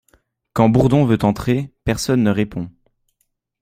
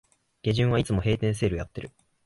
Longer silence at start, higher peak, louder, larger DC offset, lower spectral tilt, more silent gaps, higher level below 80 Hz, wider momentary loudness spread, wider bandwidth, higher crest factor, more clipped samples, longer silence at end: about the same, 0.55 s vs 0.45 s; first, -2 dBFS vs -12 dBFS; first, -18 LUFS vs -26 LUFS; neither; about the same, -7 dB/octave vs -6.5 dB/octave; neither; about the same, -40 dBFS vs -44 dBFS; second, 12 LU vs 15 LU; first, 15.5 kHz vs 11.5 kHz; about the same, 16 dB vs 14 dB; neither; first, 0.9 s vs 0.4 s